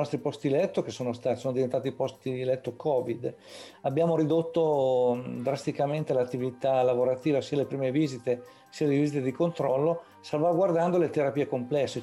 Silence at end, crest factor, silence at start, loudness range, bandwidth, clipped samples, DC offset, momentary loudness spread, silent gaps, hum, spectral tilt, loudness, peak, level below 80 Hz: 0 s; 12 dB; 0 s; 3 LU; 12 kHz; under 0.1%; under 0.1%; 8 LU; none; none; -7 dB/octave; -28 LUFS; -16 dBFS; -70 dBFS